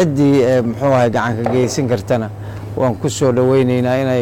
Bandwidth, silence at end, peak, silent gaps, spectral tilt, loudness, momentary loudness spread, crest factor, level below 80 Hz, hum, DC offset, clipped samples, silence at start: 16.5 kHz; 0 s; -6 dBFS; none; -6.5 dB/octave; -15 LUFS; 7 LU; 10 dB; -44 dBFS; none; under 0.1%; under 0.1%; 0 s